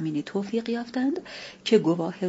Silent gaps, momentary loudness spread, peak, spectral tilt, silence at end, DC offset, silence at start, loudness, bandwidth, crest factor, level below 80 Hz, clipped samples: none; 12 LU; -6 dBFS; -6 dB/octave; 0 s; under 0.1%; 0 s; -26 LUFS; 8 kHz; 20 dB; -68 dBFS; under 0.1%